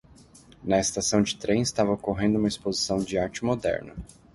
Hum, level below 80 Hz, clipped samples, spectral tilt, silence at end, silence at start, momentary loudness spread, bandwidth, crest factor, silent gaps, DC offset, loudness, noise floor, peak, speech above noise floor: none; -50 dBFS; under 0.1%; -4.5 dB/octave; 0.3 s; 0.6 s; 7 LU; 11.5 kHz; 18 dB; none; under 0.1%; -26 LUFS; -52 dBFS; -8 dBFS; 27 dB